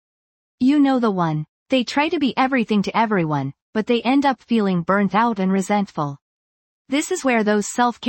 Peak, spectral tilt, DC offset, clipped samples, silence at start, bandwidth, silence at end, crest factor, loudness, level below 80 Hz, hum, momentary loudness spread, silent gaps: -4 dBFS; -5.5 dB/octave; under 0.1%; under 0.1%; 0.6 s; 16.5 kHz; 0 s; 14 dB; -20 LUFS; -62 dBFS; none; 8 LU; 1.48-1.66 s, 3.62-3.73 s, 6.21-6.85 s